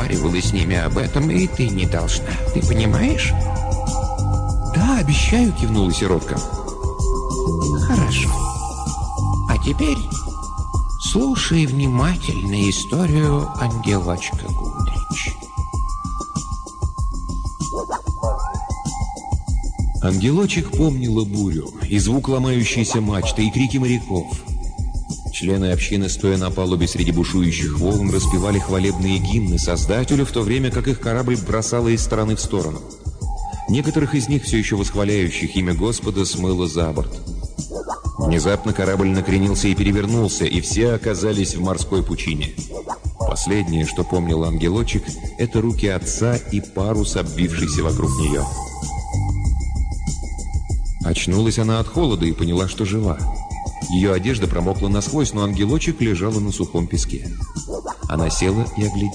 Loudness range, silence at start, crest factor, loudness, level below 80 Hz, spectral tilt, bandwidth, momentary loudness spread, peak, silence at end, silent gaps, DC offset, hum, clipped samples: 3 LU; 0 s; 12 dB; -20 LUFS; -26 dBFS; -5.5 dB/octave; 10 kHz; 9 LU; -8 dBFS; 0 s; none; under 0.1%; none; under 0.1%